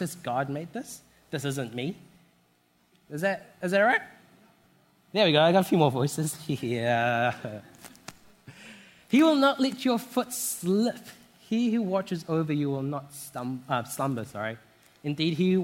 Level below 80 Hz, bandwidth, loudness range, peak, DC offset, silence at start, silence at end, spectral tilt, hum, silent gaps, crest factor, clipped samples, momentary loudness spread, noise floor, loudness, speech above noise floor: -70 dBFS; 16.5 kHz; 6 LU; -8 dBFS; under 0.1%; 0 s; 0 s; -5 dB/octave; none; none; 20 dB; under 0.1%; 21 LU; -67 dBFS; -27 LUFS; 40 dB